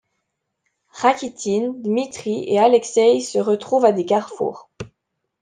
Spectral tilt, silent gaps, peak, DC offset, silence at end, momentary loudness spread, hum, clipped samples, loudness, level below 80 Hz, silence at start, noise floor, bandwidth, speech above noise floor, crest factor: -4.5 dB/octave; none; -2 dBFS; under 0.1%; 0.55 s; 11 LU; none; under 0.1%; -19 LUFS; -64 dBFS; 0.95 s; -76 dBFS; 9.8 kHz; 58 dB; 18 dB